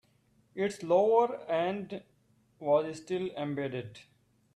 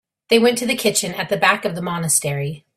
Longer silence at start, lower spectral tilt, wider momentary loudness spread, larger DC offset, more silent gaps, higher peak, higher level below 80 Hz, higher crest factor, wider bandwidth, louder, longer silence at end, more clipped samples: first, 0.55 s vs 0.3 s; first, -6 dB/octave vs -3 dB/octave; first, 17 LU vs 8 LU; neither; neither; second, -14 dBFS vs -2 dBFS; second, -74 dBFS vs -60 dBFS; about the same, 18 dB vs 18 dB; second, 12 kHz vs 16 kHz; second, -31 LUFS vs -18 LUFS; first, 0.55 s vs 0.2 s; neither